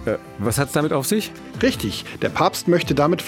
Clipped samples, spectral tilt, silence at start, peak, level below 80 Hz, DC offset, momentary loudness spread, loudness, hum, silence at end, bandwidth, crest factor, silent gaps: under 0.1%; -5 dB/octave; 0 s; -2 dBFS; -46 dBFS; under 0.1%; 8 LU; -21 LUFS; none; 0 s; 18 kHz; 18 dB; none